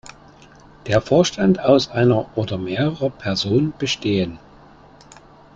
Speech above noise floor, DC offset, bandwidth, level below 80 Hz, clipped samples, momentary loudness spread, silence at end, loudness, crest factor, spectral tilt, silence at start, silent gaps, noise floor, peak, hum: 28 dB; under 0.1%; 7.8 kHz; -50 dBFS; under 0.1%; 9 LU; 1.2 s; -19 LUFS; 18 dB; -6 dB/octave; 0.05 s; none; -46 dBFS; -2 dBFS; none